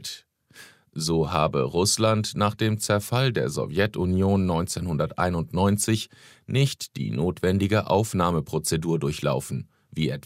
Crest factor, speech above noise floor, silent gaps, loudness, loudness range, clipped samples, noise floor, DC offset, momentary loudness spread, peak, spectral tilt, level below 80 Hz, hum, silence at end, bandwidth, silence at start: 18 dB; 27 dB; none; -24 LUFS; 2 LU; under 0.1%; -51 dBFS; under 0.1%; 8 LU; -6 dBFS; -5 dB/octave; -48 dBFS; none; 0.05 s; 16 kHz; 0 s